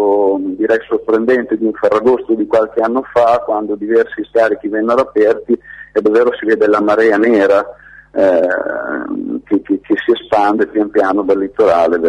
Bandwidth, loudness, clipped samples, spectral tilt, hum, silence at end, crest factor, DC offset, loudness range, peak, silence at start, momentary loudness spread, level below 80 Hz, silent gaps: 9.4 kHz; -14 LUFS; under 0.1%; -6.5 dB/octave; none; 0 s; 10 dB; under 0.1%; 2 LU; -2 dBFS; 0 s; 7 LU; -52 dBFS; none